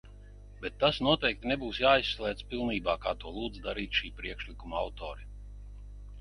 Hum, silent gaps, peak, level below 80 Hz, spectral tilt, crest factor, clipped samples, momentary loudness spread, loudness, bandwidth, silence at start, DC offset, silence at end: 50 Hz at -45 dBFS; none; -10 dBFS; -46 dBFS; -5.5 dB/octave; 22 dB; under 0.1%; 23 LU; -31 LUFS; 11 kHz; 0.05 s; under 0.1%; 0 s